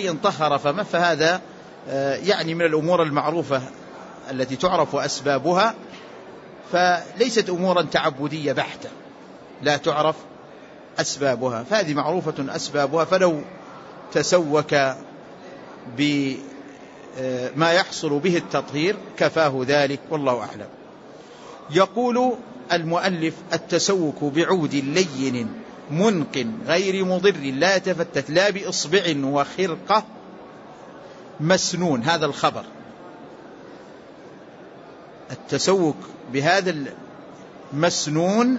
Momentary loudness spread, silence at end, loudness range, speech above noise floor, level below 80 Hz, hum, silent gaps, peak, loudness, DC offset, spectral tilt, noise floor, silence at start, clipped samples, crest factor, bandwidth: 22 LU; 0 s; 4 LU; 22 dB; -64 dBFS; none; none; -4 dBFS; -22 LUFS; under 0.1%; -4.5 dB/octave; -43 dBFS; 0 s; under 0.1%; 18 dB; 8 kHz